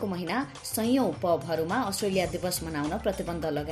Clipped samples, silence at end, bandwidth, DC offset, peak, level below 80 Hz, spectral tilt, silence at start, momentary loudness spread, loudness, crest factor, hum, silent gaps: under 0.1%; 0 s; 15.5 kHz; under 0.1%; -14 dBFS; -50 dBFS; -4.5 dB/octave; 0 s; 5 LU; -29 LUFS; 14 dB; none; none